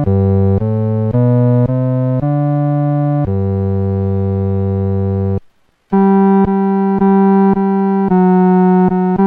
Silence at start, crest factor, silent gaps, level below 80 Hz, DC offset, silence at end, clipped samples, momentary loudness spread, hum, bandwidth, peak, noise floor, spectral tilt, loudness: 0 s; 10 dB; none; -40 dBFS; under 0.1%; 0 s; under 0.1%; 6 LU; none; 3.2 kHz; -2 dBFS; -49 dBFS; -12.5 dB/octave; -13 LUFS